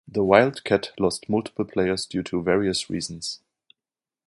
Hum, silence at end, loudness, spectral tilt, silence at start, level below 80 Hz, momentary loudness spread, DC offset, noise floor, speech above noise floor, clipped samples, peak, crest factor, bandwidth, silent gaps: none; 0.9 s; -24 LUFS; -5 dB/octave; 0.1 s; -54 dBFS; 12 LU; under 0.1%; under -90 dBFS; over 67 dB; under 0.1%; -2 dBFS; 22 dB; 11.5 kHz; none